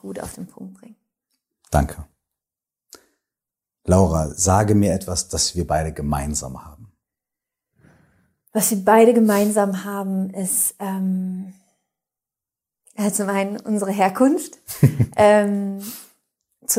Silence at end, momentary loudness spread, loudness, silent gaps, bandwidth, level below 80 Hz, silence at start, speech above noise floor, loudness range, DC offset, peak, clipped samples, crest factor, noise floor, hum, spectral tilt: 0 s; 19 LU; -19 LUFS; none; 16 kHz; -42 dBFS; 0.05 s; 70 dB; 8 LU; under 0.1%; 0 dBFS; under 0.1%; 20 dB; -89 dBFS; none; -5 dB/octave